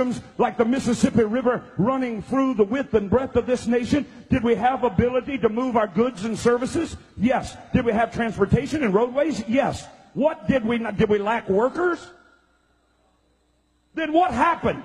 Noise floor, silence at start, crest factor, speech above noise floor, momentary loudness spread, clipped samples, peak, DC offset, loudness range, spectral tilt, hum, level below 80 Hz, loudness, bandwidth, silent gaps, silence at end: -65 dBFS; 0 s; 18 dB; 43 dB; 5 LU; under 0.1%; -4 dBFS; under 0.1%; 3 LU; -6.5 dB/octave; none; -46 dBFS; -22 LUFS; 11.5 kHz; none; 0 s